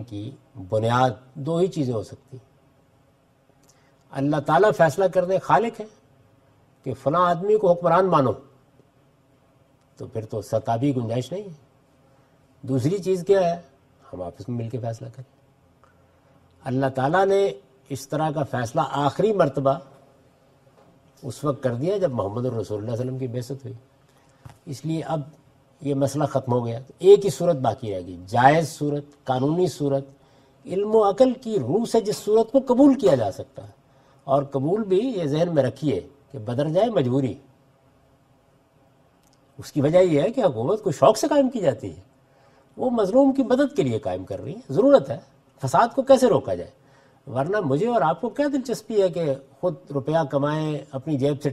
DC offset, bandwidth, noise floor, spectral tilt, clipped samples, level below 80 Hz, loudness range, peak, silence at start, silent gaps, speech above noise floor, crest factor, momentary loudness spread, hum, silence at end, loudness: under 0.1%; 14 kHz; -60 dBFS; -7 dB/octave; under 0.1%; -60 dBFS; 8 LU; 0 dBFS; 0 s; none; 38 dB; 22 dB; 17 LU; none; 0 s; -22 LUFS